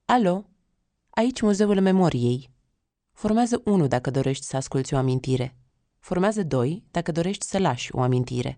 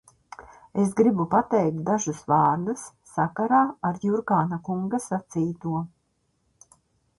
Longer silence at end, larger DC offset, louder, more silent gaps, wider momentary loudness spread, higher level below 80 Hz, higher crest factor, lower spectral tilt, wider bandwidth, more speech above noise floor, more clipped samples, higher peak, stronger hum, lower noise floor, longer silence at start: second, 0.05 s vs 1.3 s; neither; about the same, -24 LUFS vs -25 LUFS; neither; second, 8 LU vs 11 LU; first, -52 dBFS vs -62 dBFS; about the same, 16 dB vs 18 dB; about the same, -6.5 dB/octave vs -7 dB/octave; second, 10 kHz vs 11.5 kHz; first, 52 dB vs 47 dB; neither; about the same, -6 dBFS vs -8 dBFS; neither; first, -75 dBFS vs -71 dBFS; second, 0.1 s vs 0.4 s